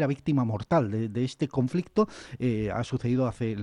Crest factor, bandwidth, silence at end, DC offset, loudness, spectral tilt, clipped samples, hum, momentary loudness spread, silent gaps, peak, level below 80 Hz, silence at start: 16 dB; 11 kHz; 0 s; under 0.1%; -28 LUFS; -8 dB/octave; under 0.1%; none; 4 LU; none; -12 dBFS; -54 dBFS; 0 s